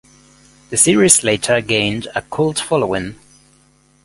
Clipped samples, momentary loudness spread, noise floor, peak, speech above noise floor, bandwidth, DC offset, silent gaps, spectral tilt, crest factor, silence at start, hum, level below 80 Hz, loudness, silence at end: under 0.1%; 13 LU; -54 dBFS; 0 dBFS; 38 dB; 16 kHz; under 0.1%; none; -3 dB/octave; 18 dB; 0.7 s; none; -48 dBFS; -15 LUFS; 0.9 s